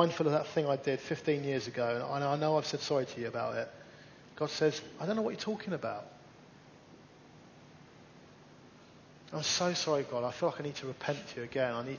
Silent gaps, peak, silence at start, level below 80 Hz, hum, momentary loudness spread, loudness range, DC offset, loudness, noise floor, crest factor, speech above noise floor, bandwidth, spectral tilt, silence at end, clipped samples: none; -12 dBFS; 0 s; -72 dBFS; none; 10 LU; 10 LU; under 0.1%; -34 LUFS; -57 dBFS; 24 dB; 23 dB; 7.2 kHz; -4.5 dB/octave; 0 s; under 0.1%